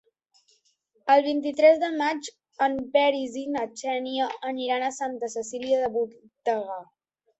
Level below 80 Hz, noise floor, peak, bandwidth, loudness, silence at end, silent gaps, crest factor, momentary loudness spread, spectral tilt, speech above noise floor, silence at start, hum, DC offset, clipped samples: -68 dBFS; -68 dBFS; -6 dBFS; 8.2 kHz; -25 LUFS; 0.55 s; none; 20 dB; 12 LU; -3 dB/octave; 44 dB; 1.05 s; none; under 0.1%; under 0.1%